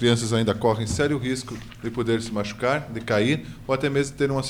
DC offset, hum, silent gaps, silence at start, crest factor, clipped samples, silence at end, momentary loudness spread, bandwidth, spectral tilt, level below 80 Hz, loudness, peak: under 0.1%; none; none; 0 s; 18 dB; under 0.1%; 0 s; 7 LU; 16 kHz; -5.5 dB/octave; -46 dBFS; -24 LUFS; -6 dBFS